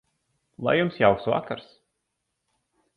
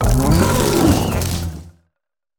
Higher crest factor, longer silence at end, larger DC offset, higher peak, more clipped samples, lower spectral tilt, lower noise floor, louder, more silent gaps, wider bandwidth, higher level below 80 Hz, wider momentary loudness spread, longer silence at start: first, 22 dB vs 16 dB; first, 1.35 s vs 0.7 s; neither; second, -6 dBFS vs -2 dBFS; neither; first, -8.5 dB/octave vs -5.5 dB/octave; about the same, -79 dBFS vs -79 dBFS; second, -24 LUFS vs -16 LUFS; neither; second, 5.2 kHz vs over 20 kHz; second, -58 dBFS vs -24 dBFS; about the same, 14 LU vs 13 LU; first, 0.6 s vs 0 s